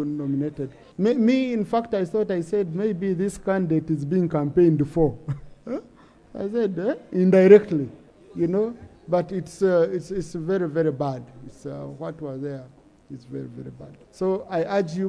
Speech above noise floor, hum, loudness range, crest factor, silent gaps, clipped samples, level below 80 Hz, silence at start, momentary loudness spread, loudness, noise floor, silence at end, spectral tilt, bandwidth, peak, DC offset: 29 dB; none; 10 LU; 22 dB; none; under 0.1%; -52 dBFS; 0 s; 17 LU; -23 LUFS; -51 dBFS; 0 s; -8 dB/octave; 11 kHz; -2 dBFS; under 0.1%